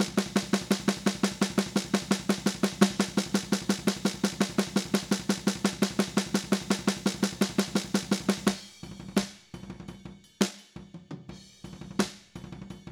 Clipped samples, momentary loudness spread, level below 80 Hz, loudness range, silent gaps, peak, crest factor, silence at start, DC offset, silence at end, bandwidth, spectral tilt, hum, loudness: under 0.1%; 17 LU; -56 dBFS; 8 LU; none; -2 dBFS; 26 dB; 0 s; under 0.1%; 0 s; 17 kHz; -4.5 dB/octave; none; -29 LUFS